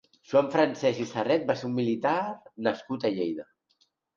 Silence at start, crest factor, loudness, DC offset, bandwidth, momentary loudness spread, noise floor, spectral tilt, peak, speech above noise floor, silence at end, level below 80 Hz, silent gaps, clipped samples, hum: 0.3 s; 18 dB; -28 LUFS; under 0.1%; 7.4 kHz; 7 LU; -70 dBFS; -6 dB/octave; -10 dBFS; 43 dB; 0.75 s; -72 dBFS; none; under 0.1%; none